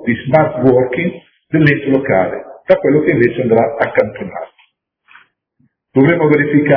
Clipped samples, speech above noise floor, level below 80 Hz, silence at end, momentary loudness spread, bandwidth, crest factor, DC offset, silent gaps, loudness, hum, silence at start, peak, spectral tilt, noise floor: 0.2%; 48 dB; -50 dBFS; 0 s; 10 LU; 5.4 kHz; 14 dB; under 0.1%; none; -13 LUFS; none; 0 s; 0 dBFS; -10.5 dB/octave; -60 dBFS